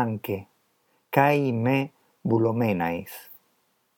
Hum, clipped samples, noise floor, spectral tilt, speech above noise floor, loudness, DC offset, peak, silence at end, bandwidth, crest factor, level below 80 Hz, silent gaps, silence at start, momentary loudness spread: none; under 0.1%; -69 dBFS; -7.5 dB/octave; 45 dB; -25 LUFS; under 0.1%; -4 dBFS; 0.65 s; 18.5 kHz; 22 dB; -68 dBFS; none; 0 s; 14 LU